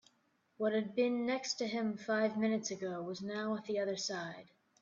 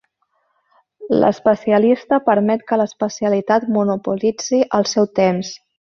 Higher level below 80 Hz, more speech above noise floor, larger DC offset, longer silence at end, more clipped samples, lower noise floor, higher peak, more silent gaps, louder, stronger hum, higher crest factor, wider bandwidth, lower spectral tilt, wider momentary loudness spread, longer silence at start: second, -82 dBFS vs -60 dBFS; second, 40 dB vs 50 dB; neither; about the same, 0.4 s vs 0.4 s; neither; first, -76 dBFS vs -67 dBFS; second, -20 dBFS vs -2 dBFS; neither; second, -36 LUFS vs -17 LUFS; neither; about the same, 16 dB vs 16 dB; about the same, 7.6 kHz vs 7.2 kHz; second, -4 dB/octave vs -5.5 dB/octave; about the same, 7 LU vs 6 LU; second, 0.6 s vs 1 s